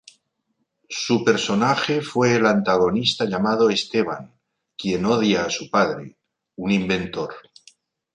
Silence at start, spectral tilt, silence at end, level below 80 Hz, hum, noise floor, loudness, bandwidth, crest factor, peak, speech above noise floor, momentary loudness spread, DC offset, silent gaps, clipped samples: 0.9 s; -5 dB/octave; 0.75 s; -56 dBFS; none; -74 dBFS; -21 LUFS; 10 kHz; 18 dB; -4 dBFS; 53 dB; 12 LU; under 0.1%; none; under 0.1%